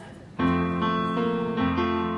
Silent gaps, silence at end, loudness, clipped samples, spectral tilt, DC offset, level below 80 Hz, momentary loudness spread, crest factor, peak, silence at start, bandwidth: none; 0 s; -25 LUFS; under 0.1%; -8 dB/octave; under 0.1%; -54 dBFS; 2 LU; 14 dB; -12 dBFS; 0 s; 6.8 kHz